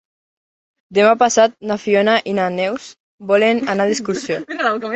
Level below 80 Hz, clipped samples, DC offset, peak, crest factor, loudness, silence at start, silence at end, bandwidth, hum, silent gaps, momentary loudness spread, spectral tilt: -62 dBFS; under 0.1%; under 0.1%; -2 dBFS; 16 dB; -16 LUFS; 0.9 s; 0 s; 8.4 kHz; none; 3.00-3.18 s; 10 LU; -4 dB/octave